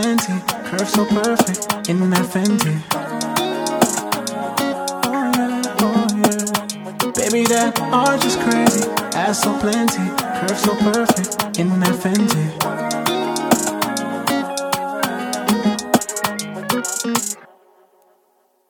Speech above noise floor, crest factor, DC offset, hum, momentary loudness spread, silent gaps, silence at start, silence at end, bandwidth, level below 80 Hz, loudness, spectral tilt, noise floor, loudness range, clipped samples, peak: 43 dB; 18 dB; under 0.1%; none; 6 LU; none; 0 s; 1.25 s; 19 kHz; -54 dBFS; -18 LUFS; -4 dB/octave; -61 dBFS; 3 LU; under 0.1%; 0 dBFS